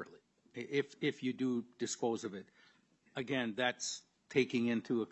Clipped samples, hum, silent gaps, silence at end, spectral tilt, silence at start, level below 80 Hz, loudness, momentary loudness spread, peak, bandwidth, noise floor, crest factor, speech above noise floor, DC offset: under 0.1%; none; none; 0.05 s; -4 dB/octave; 0 s; -86 dBFS; -37 LUFS; 14 LU; -18 dBFS; 8.2 kHz; -70 dBFS; 20 dB; 33 dB; under 0.1%